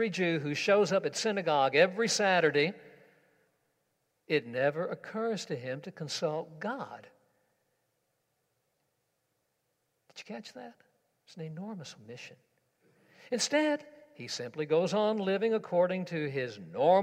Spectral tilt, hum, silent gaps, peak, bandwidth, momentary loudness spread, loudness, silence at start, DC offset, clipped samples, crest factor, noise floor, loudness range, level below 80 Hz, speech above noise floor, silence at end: -4 dB/octave; none; none; -10 dBFS; 15.5 kHz; 20 LU; -30 LUFS; 0 s; under 0.1%; under 0.1%; 22 dB; -80 dBFS; 21 LU; -84 dBFS; 49 dB; 0 s